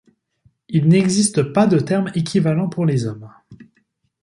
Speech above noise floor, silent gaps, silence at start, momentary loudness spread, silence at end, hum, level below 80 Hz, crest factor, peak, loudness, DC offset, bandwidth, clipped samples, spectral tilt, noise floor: 48 dB; none; 0.7 s; 8 LU; 0.6 s; none; -56 dBFS; 16 dB; -2 dBFS; -18 LUFS; under 0.1%; 11.5 kHz; under 0.1%; -6 dB/octave; -65 dBFS